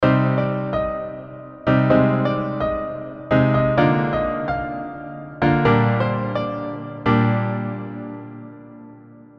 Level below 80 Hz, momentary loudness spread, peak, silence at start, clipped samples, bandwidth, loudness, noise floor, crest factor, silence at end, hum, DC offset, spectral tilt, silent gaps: -42 dBFS; 17 LU; -2 dBFS; 0 s; under 0.1%; 5.8 kHz; -20 LUFS; -43 dBFS; 18 dB; 0.15 s; none; under 0.1%; -9.5 dB/octave; none